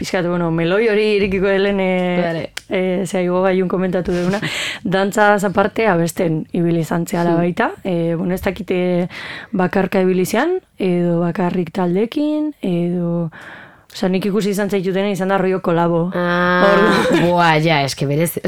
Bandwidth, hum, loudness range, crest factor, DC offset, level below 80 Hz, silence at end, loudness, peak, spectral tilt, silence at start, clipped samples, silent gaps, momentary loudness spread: 16.5 kHz; none; 5 LU; 16 dB; 0.5%; -46 dBFS; 0 s; -17 LUFS; 0 dBFS; -6 dB/octave; 0 s; under 0.1%; none; 7 LU